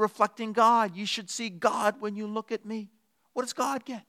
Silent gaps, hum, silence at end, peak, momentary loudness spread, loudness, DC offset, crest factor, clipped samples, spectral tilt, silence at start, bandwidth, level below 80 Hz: none; none; 0.1 s; -8 dBFS; 14 LU; -28 LUFS; under 0.1%; 20 dB; under 0.1%; -3.5 dB/octave; 0 s; 15.5 kHz; -88 dBFS